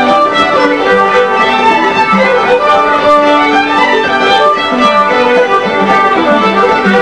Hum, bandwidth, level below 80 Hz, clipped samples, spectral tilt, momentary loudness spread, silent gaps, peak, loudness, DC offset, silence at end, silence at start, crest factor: none; 10.5 kHz; -46 dBFS; 0.4%; -4.5 dB/octave; 1 LU; none; 0 dBFS; -8 LUFS; 0.7%; 0 s; 0 s; 8 dB